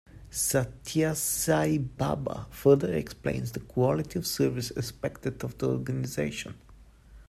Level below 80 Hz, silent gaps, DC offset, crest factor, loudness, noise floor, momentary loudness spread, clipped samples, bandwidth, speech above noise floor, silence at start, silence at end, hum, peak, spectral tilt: -52 dBFS; none; under 0.1%; 20 dB; -29 LUFS; -52 dBFS; 10 LU; under 0.1%; 15.5 kHz; 24 dB; 0.15 s; 0.05 s; none; -8 dBFS; -5 dB/octave